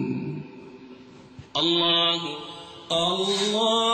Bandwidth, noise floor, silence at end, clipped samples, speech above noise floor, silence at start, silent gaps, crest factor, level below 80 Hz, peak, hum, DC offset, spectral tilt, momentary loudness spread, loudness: 14.5 kHz; -46 dBFS; 0 s; under 0.1%; 23 dB; 0 s; none; 16 dB; -62 dBFS; -10 dBFS; none; under 0.1%; -3.5 dB/octave; 21 LU; -23 LUFS